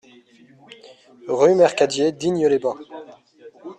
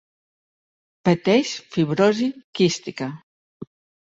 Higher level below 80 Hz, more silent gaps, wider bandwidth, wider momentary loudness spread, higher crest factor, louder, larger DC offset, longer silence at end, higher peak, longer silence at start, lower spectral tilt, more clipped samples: about the same, -66 dBFS vs -62 dBFS; second, none vs 2.44-2.53 s, 3.23-3.60 s; first, 9.6 kHz vs 8 kHz; about the same, 25 LU vs 24 LU; about the same, 18 dB vs 18 dB; first, -19 LUFS vs -22 LUFS; neither; second, 0.05 s vs 0.5 s; about the same, -4 dBFS vs -6 dBFS; first, 1.25 s vs 1.05 s; about the same, -5 dB/octave vs -5.5 dB/octave; neither